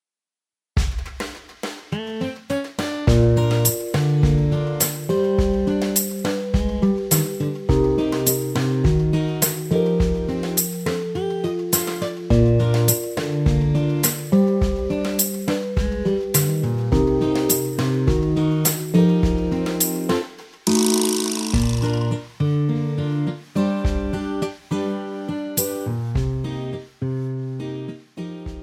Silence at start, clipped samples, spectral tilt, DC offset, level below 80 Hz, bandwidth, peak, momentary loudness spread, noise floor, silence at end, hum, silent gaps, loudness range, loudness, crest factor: 0.75 s; under 0.1%; -5.5 dB/octave; under 0.1%; -30 dBFS; over 20 kHz; -2 dBFS; 11 LU; under -90 dBFS; 0 s; none; none; 5 LU; -21 LUFS; 18 dB